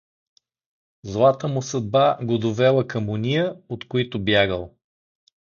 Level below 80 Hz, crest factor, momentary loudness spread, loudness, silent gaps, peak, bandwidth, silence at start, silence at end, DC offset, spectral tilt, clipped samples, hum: -52 dBFS; 18 dB; 12 LU; -21 LUFS; none; -4 dBFS; 7.4 kHz; 1.05 s; 0.8 s; under 0.1%; -6 dB/octave; under 0.1%; none